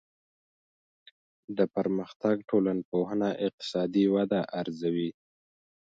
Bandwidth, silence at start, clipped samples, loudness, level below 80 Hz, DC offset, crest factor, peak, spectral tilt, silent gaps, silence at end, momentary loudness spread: 7.8 kHz; 1.5 s; under 0.1%; -29 LUFS; -70 dBFS; under 0.1%; 20 dB; -10 dBFS; -7.5 dB/octave; 2.16-2.20 s, 2.85-2.92 s, 3.53-3.58 s; 0.8 s; 7 LU